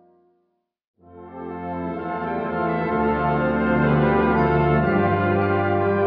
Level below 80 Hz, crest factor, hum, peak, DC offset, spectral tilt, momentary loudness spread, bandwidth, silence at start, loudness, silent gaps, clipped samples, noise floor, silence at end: -40 dBFS; 14 dB; none; -8 dBFS; under 0.1%; -10.5 dB/octave; 11 LU; 5.2 kHz; 1.1 s; -21 LUFS; none; under 0.1%; -72 dBFS; 0 s